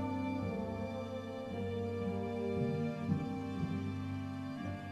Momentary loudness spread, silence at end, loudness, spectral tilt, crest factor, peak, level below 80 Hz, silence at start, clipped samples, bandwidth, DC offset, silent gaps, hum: 6 LU; 0 s; -39 LUFS; -8 dB/octave; 16 dB; -22 dBFS; -62 dBFS; 0 s; under 0.1%; 12.5 kHz; under 0.1%; none; none